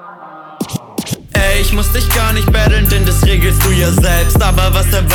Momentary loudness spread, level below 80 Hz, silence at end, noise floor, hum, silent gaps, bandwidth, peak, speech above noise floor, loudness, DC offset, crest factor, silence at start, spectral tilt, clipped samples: 12 LU; -14 dBFS; 0 s; -33 dBFS; none; none; 19 kHz; -2 dBFS; 23 dB; -12 LUFS; under 0.1%; 10 dB; 0 s; -4.5 dB/octave; under 0.1%